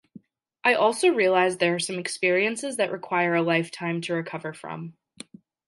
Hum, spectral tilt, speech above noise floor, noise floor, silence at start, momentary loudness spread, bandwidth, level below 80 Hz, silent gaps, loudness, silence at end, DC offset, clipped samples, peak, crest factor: none; -4 dB/octave; 27 dB; -51 dBFS; 0.65 s; 16 LU; 11.5 kHz; -78 dBFS; none; -24 LUFS; 0.75 s; under 0.1%; under 0.1%; -6 dBFS; 18 dB